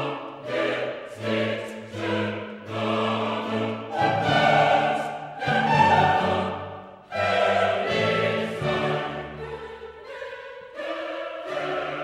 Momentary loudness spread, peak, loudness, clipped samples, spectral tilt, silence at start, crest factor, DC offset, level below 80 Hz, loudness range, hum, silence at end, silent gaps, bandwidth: 17 LU; -6 dBFS; -24 LUFS; under 0.1%; -5.5 dB/octave; 0 s; 18 dB; under 0.1%; -58 dBFS; 7 LU; none; 0 s; none; 13.5 kHz